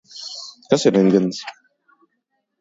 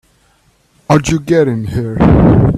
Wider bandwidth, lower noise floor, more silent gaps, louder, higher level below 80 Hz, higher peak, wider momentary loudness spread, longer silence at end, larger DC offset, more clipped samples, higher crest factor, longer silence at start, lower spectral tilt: second, 8 kHz vs 13.5 kHz; first, -73 dBFS vs -53 dBFS; neither; second, -17 LUFS vs -11 LUFS; second, -64 dBFS vs -26 dBFS; about the same, 0 dBFS vs 0 dBFS; first, 18 LU vs 9 LU; first, 1.1 s vs 0 s; neither; neither; first, 20 dB vs 12 dB; second, 0.15 s vs 0.9 s; second, -5.5 dB/octave vs -7.5 dB/octave